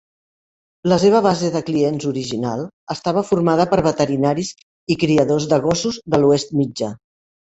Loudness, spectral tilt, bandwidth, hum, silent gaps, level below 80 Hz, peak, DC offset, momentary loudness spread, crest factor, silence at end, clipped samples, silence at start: -18 LUFS; -6 dB/octave; 8.2 kHz; none; 2.73-2.87 s, 4.63-4.87 s; -52 dBFS; -2 dBFS; under 0.1%; 10 LU; 16 dB; 0.6 s; under 0.1%; 0.85 s